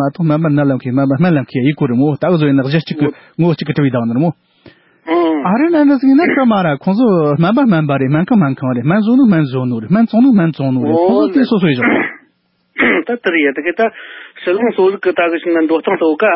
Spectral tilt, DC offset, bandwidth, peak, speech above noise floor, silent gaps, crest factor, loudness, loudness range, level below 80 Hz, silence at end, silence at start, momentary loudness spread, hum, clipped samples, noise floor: -13 dB/octave; under 0.1%; 5.8 kHz; -2 dBFS; 47 dB; none; 12 dB; -13 LUFS; 3 LU; -56 dBFS; 0 s; 0 s; 6 LU; none; under 0.1%; -59 dBFS